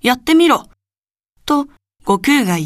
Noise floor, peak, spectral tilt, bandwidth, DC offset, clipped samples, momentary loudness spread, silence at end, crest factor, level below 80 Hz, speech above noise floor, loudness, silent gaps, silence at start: under -90 dBFS; 0 dBFS; -4.5 dB/octave; 15.5 kHz; under 0.1%; under 0.1%; 16 LU; 0 s; 16 dB; -48 dBFS; over 77 dB; -14 LUFS; 0.98-1.02 s; 0.05 s